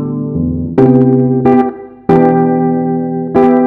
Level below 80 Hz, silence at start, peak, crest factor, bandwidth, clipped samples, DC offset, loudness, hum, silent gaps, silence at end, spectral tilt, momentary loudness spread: -38 dBFS; 0 s; 0 dBFS; 10 dB; 4.2 kHz; 0.4%; under 0.1%; -11 LUFS; none; none; 0 s; -11 dB/octave; 8 LU